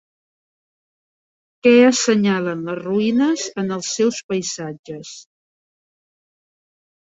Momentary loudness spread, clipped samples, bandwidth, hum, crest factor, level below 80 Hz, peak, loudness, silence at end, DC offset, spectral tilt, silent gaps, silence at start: 19 LU; under 0.1%; 8 kHz; none; 20 dB; -66 dBFS; -2 dBFS; -18 LUFS; 1.8 s; under 0.1%; -4.5 dB/octave; 4.24-4.29 s, 4.79-4.84 s; 1.65 s